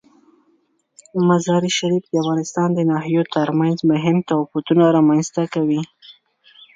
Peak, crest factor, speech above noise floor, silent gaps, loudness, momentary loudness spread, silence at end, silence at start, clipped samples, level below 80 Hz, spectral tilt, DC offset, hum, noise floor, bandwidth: -2 dBFS; 16 dB; 45 dB; none; -18 LUFS; 6 LU; 0.65 s; 1.15 s; under 0.1%; -64 dBFS; -6 dB/octave; under 0.1%; none; -62 dBFS; 9.2 kHz